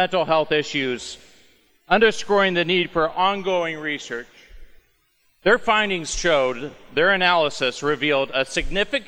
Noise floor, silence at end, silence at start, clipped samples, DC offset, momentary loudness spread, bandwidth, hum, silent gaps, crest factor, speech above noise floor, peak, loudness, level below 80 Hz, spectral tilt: -63 dBFS; 0.05 s; 0 s; under 0.1%; under 0.1%; 10 LU; over 20 kHz; none; none; 18 dB; 42 dB; -4 dBFS; -20 LUFS; -42 dBFS; -3.5 dB/octave